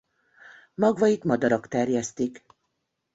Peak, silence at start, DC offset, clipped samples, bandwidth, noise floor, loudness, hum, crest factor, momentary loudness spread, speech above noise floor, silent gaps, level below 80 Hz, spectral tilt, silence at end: -8 dBFS; 0.8 s; under 0.1%; under 0.1%; 8 kHz; -78 dBFS; -25 LUFS; none; 18 dB; 10 LU; 54 dB; none; -66 dBFS; -6 dB/octave; 0.8 s